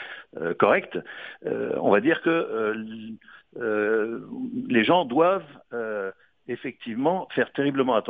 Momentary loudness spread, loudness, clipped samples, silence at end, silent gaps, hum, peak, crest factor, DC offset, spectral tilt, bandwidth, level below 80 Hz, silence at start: 16 LU; -25 LUFS; under 0.1%; 0 s; none; none; -6 dBFS; 20 dB; under 0.1%; -8.5 dB/octave; 4.8 kHz; -70 dBFS; 0 s